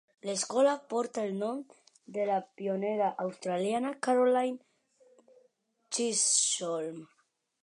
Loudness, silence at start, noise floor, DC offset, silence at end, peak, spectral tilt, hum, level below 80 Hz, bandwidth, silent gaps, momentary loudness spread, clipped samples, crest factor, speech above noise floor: -30 LUFS; 0.25 s; -71 dBFS; under 0.1%; 0.55 s; -14 dBFS; -2.5 dB/octave; none; -88 dBFS; 11 kHz; none; 11 LU; under 0.1%; 18 dB; 40 dB